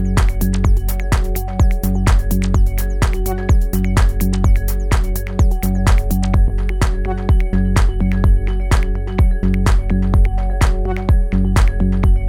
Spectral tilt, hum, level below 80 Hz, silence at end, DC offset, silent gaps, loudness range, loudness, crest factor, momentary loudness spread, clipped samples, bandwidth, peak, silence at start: -6.5 dB/octave; none; -16 dBFS; 0 s; under 0.1%; none; 1 LU; -17 LUFS; 12 dB; 3 LU; under 0.1%; 17.5 kHz; -2 dBFS; 0 s